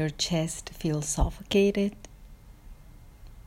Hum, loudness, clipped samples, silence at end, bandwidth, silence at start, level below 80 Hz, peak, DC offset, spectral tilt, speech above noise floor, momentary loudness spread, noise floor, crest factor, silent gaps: none; -28 LUFS; under 0.1%; 0.05 s; 16 kHz; 0 s; -40 dBFS; -12 dBFS; under 0.1%; -4.5 dB/octave; 22 dB; 9 LU; -49 dBFS; 18 dB; none